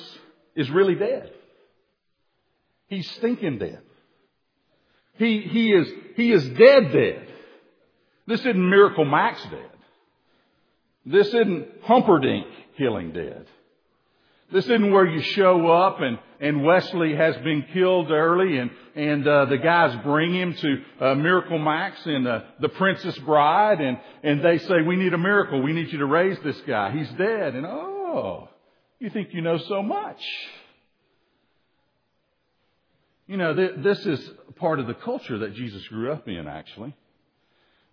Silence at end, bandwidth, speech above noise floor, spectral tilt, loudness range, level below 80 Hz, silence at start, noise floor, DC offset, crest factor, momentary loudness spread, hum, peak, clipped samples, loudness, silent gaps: 1 s; 5.4 kHz; 52 dB; -8 dB/octave; 11 LU; -68 dBFS; 0 s; -73 dBFS; under 0.1%; 22 dB; 15 LU; none; 0 dBFS; under 0.1%; -22 LUFS; none